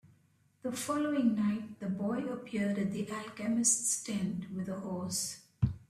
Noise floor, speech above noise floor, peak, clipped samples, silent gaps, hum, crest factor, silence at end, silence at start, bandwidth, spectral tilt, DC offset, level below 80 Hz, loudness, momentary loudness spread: -69 dBFS; 35 dB; -14 dBFS; under 0.1%; none; none; 20 dB; 0.05 s; 0.65 s; 14.5 kHz; -4.5 dB/octave; under 0.1%; -58 dBFS; -33 LUFS; 10 LU